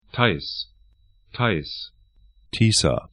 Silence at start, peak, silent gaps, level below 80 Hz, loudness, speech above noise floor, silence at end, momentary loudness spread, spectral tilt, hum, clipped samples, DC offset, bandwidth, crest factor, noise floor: 0.15 s; 0 dBFS; none; -44 dBFS; -22 LUFS; 35 dB; 0.05 s; 19 LU; -4 dB/octave; none; under 0.1%; under 0.1%; 10.5 kHz; 24 dB; -57 dBFS